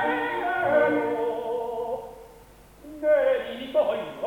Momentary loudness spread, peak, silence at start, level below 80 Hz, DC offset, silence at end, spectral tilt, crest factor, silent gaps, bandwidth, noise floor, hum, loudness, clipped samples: 11 LU; -8 dBFS; 0 s; -58 dBFS; under 0.1%; 0 s; -5.5 dB/octave; 18 dB; none; 18.5 kHz; -50 dBFS; none; -25 LUFS; under 0.1%